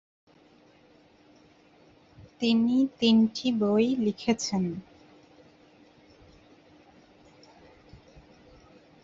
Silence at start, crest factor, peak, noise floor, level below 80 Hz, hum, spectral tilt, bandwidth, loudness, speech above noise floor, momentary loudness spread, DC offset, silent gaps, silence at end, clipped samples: 2.2 s; 20 dB; -10 dBFS; -59 dBFS; -64 dBFS; none; -5.5 dB/octave; 7.8 kHz; -26 LUFS; 34 dB; 8 LU; under 0.1%; none; 4.2 s; under 0.1%